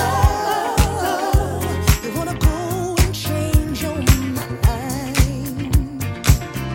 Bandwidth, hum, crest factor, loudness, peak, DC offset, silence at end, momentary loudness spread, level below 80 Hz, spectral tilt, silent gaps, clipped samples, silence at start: 17 kHz; none; 18 dB; -20 LUFS; 0 dBFS; under 0.1%; 0 s; 5 LU; -22 dBFS; -5 dB/octave; none; under 0.1%; 0 s